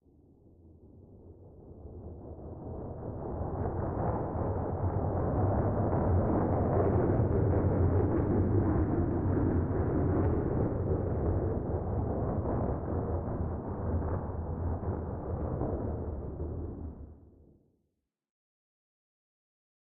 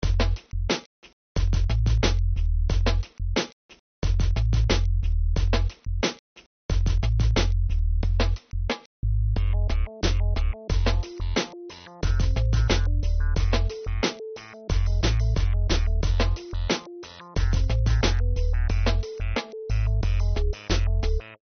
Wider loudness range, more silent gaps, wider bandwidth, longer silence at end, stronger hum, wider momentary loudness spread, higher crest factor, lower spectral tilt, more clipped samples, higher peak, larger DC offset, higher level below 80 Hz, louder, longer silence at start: first, 13 LU vs 1 LU; second, none vs 0.86-1.02 s, 1.13-1.35 s, 3.53-3.69 s, 3.79-4.02 s, 6.19-6.36 s, 6.46-6.69 s, 8.86-9.03 s; second, 2.5 kHz vs 6.6 kHz; first, 2.7 s vs 0.1 s; neither; first, 14 LU vs 7 LU; about the same, 16 dB vs 16 dB; first, -13 dB/octave vs -5 dB/octave; neither; second, -16 dBFS vs -6 dBFS; neither; second, -42 dBFS vs -24 dBFS; second, -32 LUFS vs -26 LUFS; first, 0.65 s vs 0 s